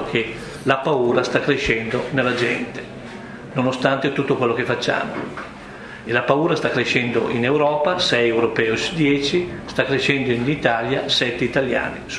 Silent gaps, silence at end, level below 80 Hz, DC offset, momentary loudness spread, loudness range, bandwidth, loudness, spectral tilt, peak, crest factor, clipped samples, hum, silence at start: none; 0 s; -48 dBFS; under 0.1%; 12 LU; 3 LU; 11 kHz; -20 LUFS; -5 dB/octave; 0 dBFS; 20 dB; under 0.1%; none; 0 s